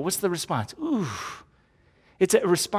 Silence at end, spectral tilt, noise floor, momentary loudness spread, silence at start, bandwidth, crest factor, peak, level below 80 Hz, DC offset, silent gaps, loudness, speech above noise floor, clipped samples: 0 s; -4 dB/octave; -61 dBFS; 14 LU; 0 s; 16 kHz; 20 dB; -6 dBFS; -60 dBFS; under 0.1%; none; -26 LUFS; 36 dB; under 0.1%